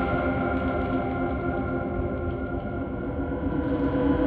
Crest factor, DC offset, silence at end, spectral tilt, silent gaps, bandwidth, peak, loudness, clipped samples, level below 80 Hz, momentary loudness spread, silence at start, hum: 14 dB; under 0.1%; 0 s; -11 dB/octave; none; 4.6 kHz; -12 dBFS; -28 LUFS; under 0.1%; -38 dBFS; 5 LU; 0 s; none